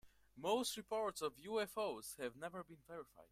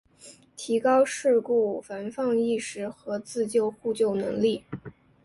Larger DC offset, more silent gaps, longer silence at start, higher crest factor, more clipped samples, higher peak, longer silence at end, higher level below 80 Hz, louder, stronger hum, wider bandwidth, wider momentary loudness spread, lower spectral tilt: neither; neither; second, 0.05 s vs 0.25 s; about the same, 18 dB vs 14 dB; neither; second, -26 dBFS vs -12 dBFS; second, 0.05 s vs 0.35 s; second, -76 dBFS vs -66 dBFS; second, -43 LUFS vs -26 LUFS; neither; first, 16 kHz vs 11.5 kHz; about the same, 15 LU vs 13 LU; second, -3 dB/octave vs -5 dB/octave